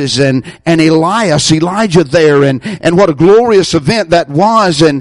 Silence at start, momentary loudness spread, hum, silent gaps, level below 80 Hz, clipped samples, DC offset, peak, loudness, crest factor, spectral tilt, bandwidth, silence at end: 0 s; 5 LU; none; none; -40 dBFS; under 0.1%; under 0.1%; 0 dBFS; -9 LUFS; 8 dB; -5.5 dB/octave; 11.5 kHz; 0 s